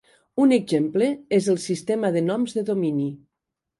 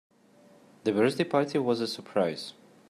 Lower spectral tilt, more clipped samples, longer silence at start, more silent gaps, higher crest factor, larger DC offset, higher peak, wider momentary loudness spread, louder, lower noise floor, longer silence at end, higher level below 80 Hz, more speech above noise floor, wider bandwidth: about the same, -6.5 dB/octave vs -5.5 dB/octave; neither; second, 0.35 s vs 0.85 s; neither; about the same, 16 dB vs 18 dB; neither; about the same, -8 dBFS vs -10 dBFS; about the same, 6 LU vs 8 LU; first, -23 LUFS vs -28 LUFS; first, -84 dBFS vs -58 dBFS; first, 0.6 s vs 0.4 s; first, -68 dBFS vs -74 dBFS; first, 62 dB vs 31 dB; second, 11.5 kHz vs 14 kHz